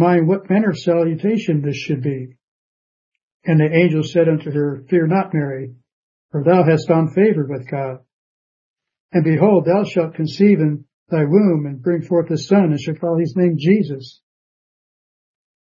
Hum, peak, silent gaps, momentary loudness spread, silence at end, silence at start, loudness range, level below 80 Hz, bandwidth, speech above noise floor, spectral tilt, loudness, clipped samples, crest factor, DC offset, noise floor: none; 0 dBFS; 2.43-3.12 s, 3.23-3.40 s, 5.93-6.29 s, 8.13-8.74 s, 9.00-9.09 s, 10.93-11.06 s; 11 LU; 1.6 s; 0 s; 3 LU; -62 dBFS; 7.4 kHz; over 74 dB; -8.5 dB/octave; -17 LUFS; under 0.1%; 16 dB; under 0.1%; under -90 dBFS